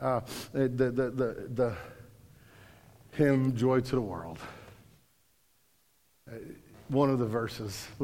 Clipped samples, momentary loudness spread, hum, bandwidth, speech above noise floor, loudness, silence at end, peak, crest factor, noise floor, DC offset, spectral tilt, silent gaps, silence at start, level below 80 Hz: under 0.1%; 20 LU; none; 16.5 kHz; 40 dB; -30 LUFS; 0 s; -12 dBFS; 20 dB; -70 dBFS; under 0.1%; -7 dB/octave; none; 0 s; -60 dBFS